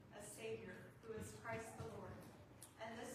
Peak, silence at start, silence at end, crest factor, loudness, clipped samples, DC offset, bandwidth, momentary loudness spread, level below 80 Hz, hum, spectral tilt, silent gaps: -36 dBFS; 0 s; 0 s; 18 dB; -53 LUFS; under 0.1%; under 0.1%; 15 kHz; 9 LU; -74 dBFS; none; -4.5 dB/octave; none